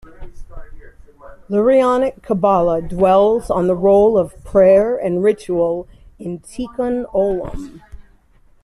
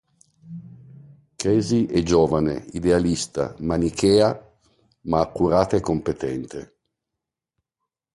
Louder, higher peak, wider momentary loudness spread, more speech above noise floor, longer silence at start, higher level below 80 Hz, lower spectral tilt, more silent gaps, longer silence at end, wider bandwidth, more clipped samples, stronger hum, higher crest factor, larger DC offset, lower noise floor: first, -16 LUFS vs -21 LUFS; about the same, -2 dBFS vs -4 dBFS; second, 16 LU vs 19 LU; second, 35 dB vs 64 dB; second, 0.2 s vs 0.45 s; first, -38 dBFS vs -44 dBFS; first, -7.5 dB/octave vs -6 dB/octave; neither; second, 0.6 s vs 1.55 s; about the same, 12 kHz vs 11.5 kHz; neither; neither; second, 14 dB vs 20 dB; neither; second, -51 dBFS vs -85 dBFS